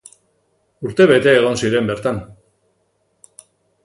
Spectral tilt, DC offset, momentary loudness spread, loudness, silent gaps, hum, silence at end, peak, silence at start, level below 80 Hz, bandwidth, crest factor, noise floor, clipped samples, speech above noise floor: -5.5 dB/octave; under 0.1%; 14 LU; -15 LUFS; none; none; 1.55 s; 0 dBFS; 0.8 s; -52 dBFS; 11.5 kHz; 18 dB; -65 dBFS; under 0.1%; 50 dB